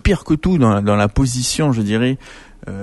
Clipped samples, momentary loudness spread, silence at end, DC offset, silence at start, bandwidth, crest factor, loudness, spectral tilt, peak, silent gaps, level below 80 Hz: under 0.1%; 11 LU; 0 s; under 0.1%; 0.05 s; 12 kHz; 14 dB; -16 LUFS; -5.5 dB/octave; -2 dBFS; none; -30 dBFS